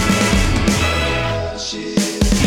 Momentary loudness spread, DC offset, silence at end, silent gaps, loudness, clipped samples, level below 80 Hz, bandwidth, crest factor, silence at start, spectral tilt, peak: 7 LU; under 0.1%; 0 s; none; -17 LUFS; under 0.1%; -24 dBFS; 18 kHz; 16 dB; 0 s; -4.5 dB/octave; -2 dBFS